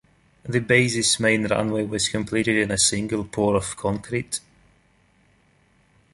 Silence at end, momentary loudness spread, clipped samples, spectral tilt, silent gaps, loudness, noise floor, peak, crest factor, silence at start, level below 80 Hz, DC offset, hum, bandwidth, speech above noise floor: 1.75 s; 9 LU; under 0.1%; -3.5 dB/octave; none; -22 LUFS; -61 dBFS; -2 dBFS; 22 dB; 0.45 s; -50 dBFS; under 0.1%; none; 11.5 kHz; 38 dB